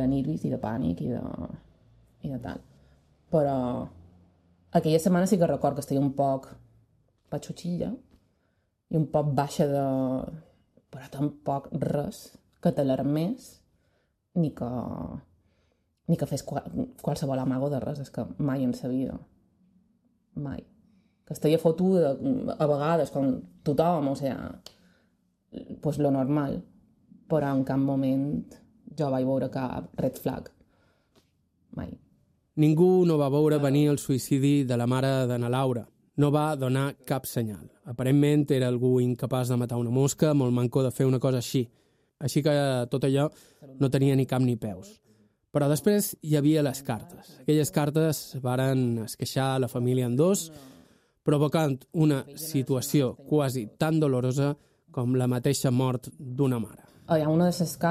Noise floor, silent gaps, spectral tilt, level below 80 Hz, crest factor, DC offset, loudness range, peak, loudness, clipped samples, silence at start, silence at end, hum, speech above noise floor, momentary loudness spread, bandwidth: -72 dBFS; none; -7 dB/octave; -60 dBFS; 18 dB; under 0.1%; 7 LU; -8 dBFS; -27 LUFS; under 0.1%; 0 s; 0 s; none; 46 dB; 14 LU; 15 kHz